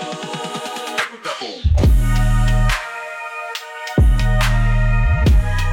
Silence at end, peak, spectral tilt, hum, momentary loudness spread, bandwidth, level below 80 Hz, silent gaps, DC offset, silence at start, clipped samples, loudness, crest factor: 0 s; -6 dBFS; -5.5 dB/octave; none; 11 LU; 17 kHz; -18 dBFS; none; under 0.1%; 0 s; under 0.1%; -19 LUFS; 10 dB